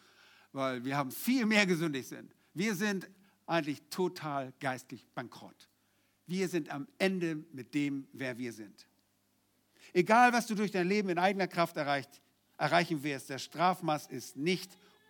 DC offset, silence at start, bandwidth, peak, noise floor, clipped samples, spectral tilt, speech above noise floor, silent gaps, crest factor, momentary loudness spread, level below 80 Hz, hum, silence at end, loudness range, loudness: under 0.1%; 0.55 s; 19.5 kHz; -10 dBFS; -74 dBFS; under 0.1%; -5 dB/octave; 42 dB; none; 24 dB; 17 LU; -88 dBFS; none; 0.35 s; 8 LU; -33 LUFS